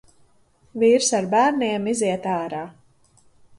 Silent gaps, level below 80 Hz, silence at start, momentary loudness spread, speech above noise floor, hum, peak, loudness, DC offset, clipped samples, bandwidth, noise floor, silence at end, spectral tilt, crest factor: none; -64 dBFS; 0.75 s; 15 LU; 38 dB; none; -6 dBFS; -21 LUFS; under 0.1%; under 0.1%; 11.5 kHz; -58 dBFS; 0.9 s; -3.5 dB/octave; 16 dB